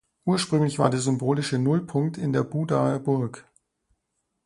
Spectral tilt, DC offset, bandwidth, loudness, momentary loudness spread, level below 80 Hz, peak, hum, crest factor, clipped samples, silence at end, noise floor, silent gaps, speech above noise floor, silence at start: -6.5 dB/octave; under 0.1%; 11.5 kHz; -25 LUFS; 4 LU; -62 dBFS; -4 dBFS; none; 22 dB; under 0.1%; 1.05 s; -78 dBFS; none; 54 dB; 0.25 s